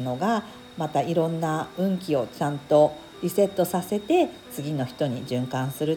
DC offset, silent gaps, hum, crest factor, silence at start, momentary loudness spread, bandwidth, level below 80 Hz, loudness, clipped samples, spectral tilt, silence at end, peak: under 0.1%; none; none; 18 dB; 0 s; 8 LU; 19 kHz; -62 dBFS; -25 LUFS; under 0.1%; -6.5 dB/octave; 0 s; -6 dBFS